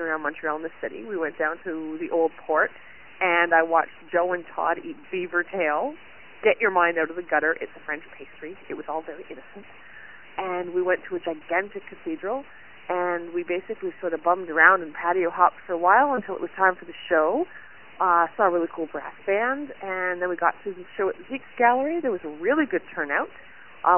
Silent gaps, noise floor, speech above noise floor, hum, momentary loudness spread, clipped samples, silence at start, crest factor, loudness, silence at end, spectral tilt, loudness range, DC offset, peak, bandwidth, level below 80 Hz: none; -46 dBFS; 21 dB; none; 15 LU; under 0.1%; 0 s; 24 dB; -24 LUFS; 0 s; -8 dB/octave; 8 LU; 0.4%; 0 dBFS; 3.2 kHz; -68 dBFS